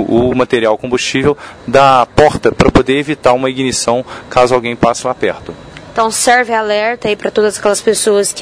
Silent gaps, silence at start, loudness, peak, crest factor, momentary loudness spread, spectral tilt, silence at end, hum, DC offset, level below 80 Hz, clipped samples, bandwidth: none; 0 s; -12 LUFS; 0 dBFS; 12 dB; 7 LU; -4 dB/octave; 0 s; none; under 0.1%; -34 dBFS; 0.5%; 11 kHz